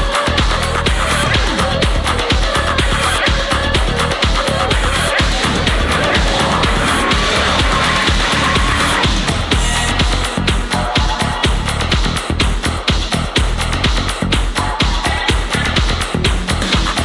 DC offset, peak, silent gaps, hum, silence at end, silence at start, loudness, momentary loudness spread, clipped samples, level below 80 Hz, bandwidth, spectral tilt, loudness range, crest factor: under 0.1%; -2 dBFS; none; none; 0 s; 0 s; -15 LUFS; 3 LU; under 0.1%; -20 dBFS; 11.5 kHz; -4 dB/octave; 3 LU; 12 dB